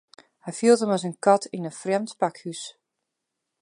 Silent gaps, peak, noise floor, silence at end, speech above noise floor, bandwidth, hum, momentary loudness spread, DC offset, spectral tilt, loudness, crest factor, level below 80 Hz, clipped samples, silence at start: none; -4 dBFS; -82 dBFS; 0.9 s; 59 dB; 11 kHz; none; 17 LU; under 0.1%; -5 dB/octave; -24 LUFS; 20 dB; -80 dBFS; under 0.1%; 0.45 s